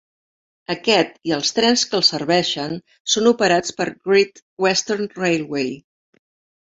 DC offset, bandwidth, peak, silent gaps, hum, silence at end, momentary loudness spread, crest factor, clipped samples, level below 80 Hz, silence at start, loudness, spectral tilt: under 0.1%; 8 kHz; 0 dBFS; 3.00-3.05 s, 4.42-4.57 s; none; 0.85 s; 11 LU; 20 dB; under 0.1%; -62 dBFS; 0.7 s; -19 LUFS; -3 dB/octave